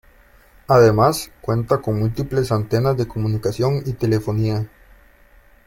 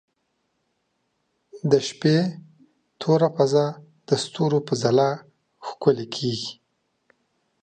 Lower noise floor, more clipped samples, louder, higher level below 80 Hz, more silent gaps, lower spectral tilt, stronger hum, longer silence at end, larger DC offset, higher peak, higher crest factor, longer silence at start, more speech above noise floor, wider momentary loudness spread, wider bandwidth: second, -50 dBFS vs -73 dBFS; neither; first, -19 LUFS vs -23 LUFS; first, -42 dBFS vs -66 dBFS; neither; about the same, -7 dB/octave vs -6 dB/octave; neither; about the same, 1 s vs 1.1 s; neither; about the same, -2 dBFS vs -4 dBFS; about the same, 18 dB vs 20 dB; second, 0.7 s vs 1.55 s; second, 32 dB vs 52 dB; second, 9 LU vs 13 LU; first, 16.5 kHz vs 9.4 kHz